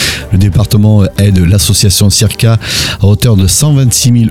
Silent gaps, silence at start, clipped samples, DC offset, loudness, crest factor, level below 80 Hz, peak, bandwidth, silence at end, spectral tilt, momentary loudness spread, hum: none; 0 s; under 0.1%; under 0.1%; -8 LUFS; 8 dB; -24 dBFS; 0 dBFS; 16.5 kHz; 0 s; -4.5 dB/octave; 3 LU; none